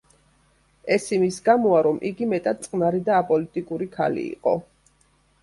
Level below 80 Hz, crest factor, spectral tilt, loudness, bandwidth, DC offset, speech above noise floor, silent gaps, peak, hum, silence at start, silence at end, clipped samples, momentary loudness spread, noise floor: -62 dBFS; 18 dB; -6 dB/octave; -23 LUFS; 11.5 kHz; under 0.1%; 40 dB; none; -6 dBFS; none; 0.85 s; 0.8 s; under 0.1%; 9 LU; -62 dBFS